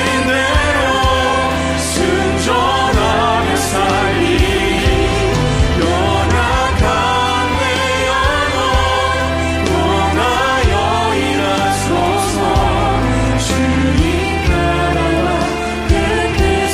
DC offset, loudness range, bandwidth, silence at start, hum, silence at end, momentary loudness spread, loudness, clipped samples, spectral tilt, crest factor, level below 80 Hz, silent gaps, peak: under 0.1%; 1 LU; 15.5 kHz; 0 s; none; 0 s; 2 LU; -14 LUFS; under 0.1%; -4.5 dB/octave; 14 dB; -22 dBFS; none; 0 dBFS